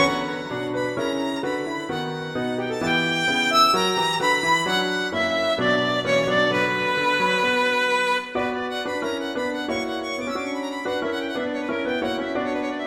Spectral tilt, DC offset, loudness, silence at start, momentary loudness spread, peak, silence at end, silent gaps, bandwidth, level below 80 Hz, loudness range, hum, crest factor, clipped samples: -3.5 dB/octave; under 0.1%; -23 LUFS; 0 s; 8 LU; -4 dBFS; 0 s; none; 16 kHz; -58 dBFS; 6 LU; none; 18 dB; under 0.1%